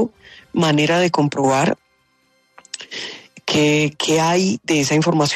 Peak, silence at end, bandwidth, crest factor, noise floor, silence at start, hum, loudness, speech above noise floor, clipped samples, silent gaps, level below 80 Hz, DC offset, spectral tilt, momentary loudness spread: -4 dBFS; 0 s; 13.5 kHz; 14 dB; -62 dBFS; 0 s; none; -17 LUFS; 45 dB; under 0.1%; none; -58 dBFS; under 0.1%; -4.5 dB/octave; 14 LU